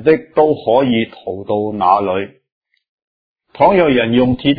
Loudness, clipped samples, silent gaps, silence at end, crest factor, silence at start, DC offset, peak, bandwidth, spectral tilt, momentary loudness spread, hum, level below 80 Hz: -14 LUFS; under 0.1%; 2.52-2.61 s, 2.88-3.36 s; 0 s; 14 dB; 0 s; under 0.1%; 0 dBFS; 5 kHz; -9.5 dB/octave; 10 LU; none; -46 dBFS